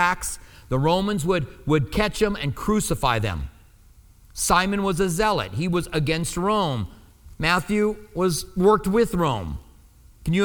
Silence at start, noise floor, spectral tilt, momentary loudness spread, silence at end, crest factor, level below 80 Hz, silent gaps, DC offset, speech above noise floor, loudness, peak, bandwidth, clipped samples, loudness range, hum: 0 s; -51 dBFS; -5 dB/octave; 11 LU; 0 s; 18 dB; -38 dBFS; none; under 0.1%; 29 dB; -23 LUFS; -4 dBFS; 20 kHz; under 0.1%; 1 LU; none